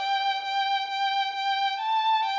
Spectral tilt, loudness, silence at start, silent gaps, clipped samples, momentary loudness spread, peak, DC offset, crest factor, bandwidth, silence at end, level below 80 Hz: 5.5 dB/octave; -26 LUFS; 0 s; none; under 0.1%; 3 LU; -16 dBFS; under 0.1%; 10 dB; 7.6 kHz; 0 s; under -90 dBFS